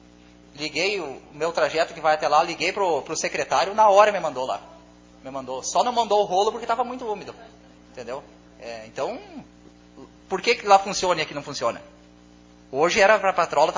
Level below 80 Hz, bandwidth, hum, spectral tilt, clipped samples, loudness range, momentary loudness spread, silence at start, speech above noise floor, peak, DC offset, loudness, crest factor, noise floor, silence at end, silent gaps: -58 dBFS; 7.6 kHz; 60 Hz at -55 dBFS; -2.5 dB/octave; under 0.1%; 10 LU; 19 LU; 0.55 s; 28 dB; -2 dBFS; under 0.1%; -22 LUFS; 22 dB; -50 dBFS; 0 s; none